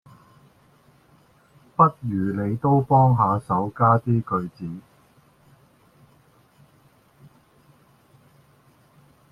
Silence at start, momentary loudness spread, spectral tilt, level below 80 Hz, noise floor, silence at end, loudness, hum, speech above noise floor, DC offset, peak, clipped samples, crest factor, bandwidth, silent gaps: 1.8 s; 16 LU; -10.5 dB/octave; -58 dBFS; -58 dBFS; 4.5 s; -21 LUFS; none; 37 dB; under 0.1%; -4 dBFS; under 0.1%; 22 dB; 10.5 kHz; none